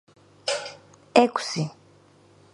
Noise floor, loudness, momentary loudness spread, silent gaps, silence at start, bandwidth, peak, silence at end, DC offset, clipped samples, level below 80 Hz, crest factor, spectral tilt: -56 dBFS; -25 LUFS; 13 LU; none; 0.45 s; 11.5 kHz; 0 dBFS; 0.8 s; under 0.1%; under 0.1%; -68 dBFS; 26 dB; -4.5 dB/octave